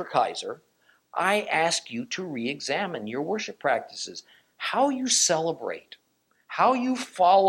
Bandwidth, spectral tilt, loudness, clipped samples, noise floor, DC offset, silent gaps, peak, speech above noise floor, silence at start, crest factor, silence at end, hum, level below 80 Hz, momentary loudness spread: 16.5 kHz; -2 dB/octave; -26 LUFS; under 0.1%; -69 dBFS; under 0.1%; none; -8 dBFS; 44 dB; 0 s; 18 dB; 0 s; none; -78 dBFS; 14 LU